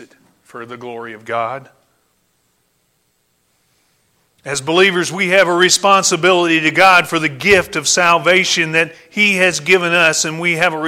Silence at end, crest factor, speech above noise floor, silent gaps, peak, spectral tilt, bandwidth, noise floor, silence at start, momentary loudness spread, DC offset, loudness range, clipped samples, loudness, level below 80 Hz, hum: 0 s; 16 dB; 49 dB; none; 0 dBFS; -2.5 dB/octave; 16.5 kHz; -63 dBFS; 0 s; 19 LU; under 0.1%; 18 LU; under 0.1%; -12 LUFS; -54 dBFS; none